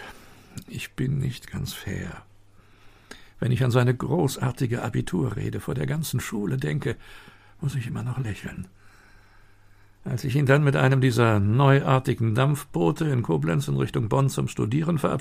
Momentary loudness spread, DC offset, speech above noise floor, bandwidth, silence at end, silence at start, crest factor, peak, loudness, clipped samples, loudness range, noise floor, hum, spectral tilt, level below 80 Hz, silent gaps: 15 LU; under 0.1%; 29 dB; 15.5 kHz; 0 s; 0 s; 22 dB; -4 dBFS; -25 LUFS; under 0.1%; 11 LU; -53 dBFS; none; -7 dB/octave; -48 dBFS; none